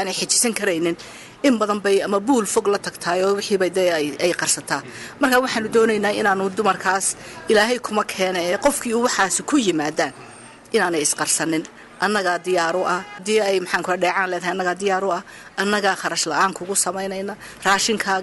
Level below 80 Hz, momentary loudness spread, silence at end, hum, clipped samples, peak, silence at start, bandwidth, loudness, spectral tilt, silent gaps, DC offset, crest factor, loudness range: -58 dBFS; 7 LU; 0 s; none; under 0.1%; -6 dBFS; 0 s; 14.5 kHz; -20 LUFS; -2.5 dB/octave; none; under 0.1%; 16 dB; 2 LU